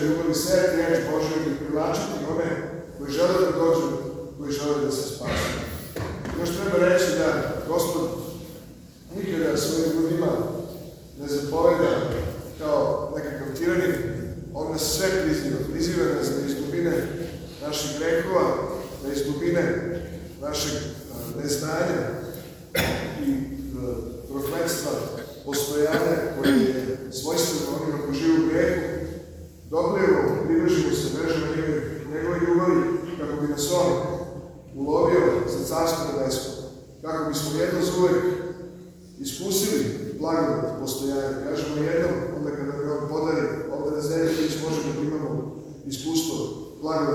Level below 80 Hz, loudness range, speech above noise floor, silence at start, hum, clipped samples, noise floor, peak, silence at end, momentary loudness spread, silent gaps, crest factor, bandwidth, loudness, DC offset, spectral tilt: -48 dBFS; 4 LU; 21 dB; 0 s; none; under 0.1%; -45 dBFS; -6 dBFS; 0 s; 13 LU; none; 18 dB; over 20 kHz; -25 LUFS; under 0.1%; -5 dB/octave